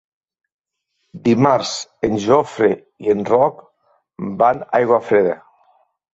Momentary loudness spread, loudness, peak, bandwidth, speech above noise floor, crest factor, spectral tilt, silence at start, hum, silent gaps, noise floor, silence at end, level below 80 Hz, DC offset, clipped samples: 9 LU; -17 LUFS; -2 dBFS; 8 kHz; 56 dB; 16 dB; -5.5 dB/octave; 1.15 s; none; none; -72 dBFS; 0.75 s; -56 dBFS; under 0.1%; under 0.1%